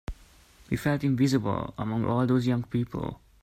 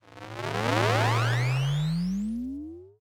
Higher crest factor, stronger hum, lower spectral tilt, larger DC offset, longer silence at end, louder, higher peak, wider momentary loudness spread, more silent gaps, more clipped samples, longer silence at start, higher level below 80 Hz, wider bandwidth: about the same, 16 dB vs 20 dB; neither; first, -7.5 dB/octave vs -6 dB/octave; neither; first, 0.25 s vs 0.1 s; about the same, -28 LUFS vs -27 LUFS; second, -12 dBFS vs -8 dBFS; second, 10 LU vs 14 LU; neither; neither; about the same, 0.1 s vs 0.1 s; about the same, -48 dBFS vs -50 dBFS; about the same, 15.5 kHz vs 16.5 kHz